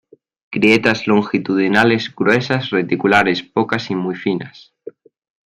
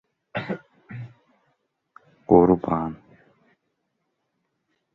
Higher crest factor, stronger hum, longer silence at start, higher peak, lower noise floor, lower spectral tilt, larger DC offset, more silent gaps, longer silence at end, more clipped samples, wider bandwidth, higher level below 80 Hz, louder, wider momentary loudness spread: second, 16 dB vs 24 dB; neither; first, 0.5 s vs 0.35 s; about the same, 0 dBFS vs -2 dBFS; second, -38 dBFS vs -76 dBFS; second, -6 dB/octave vs -10.5 dB/octave; neither; neither; second, 0.9 s vs 2 s; neither; first, 11.5 kHz vs 4.8 kHz; about the same, -56 dBFS vs -52 dBFS; first, -16 LUFS vs -22 LUFS; second, 9 LU vs 27 LU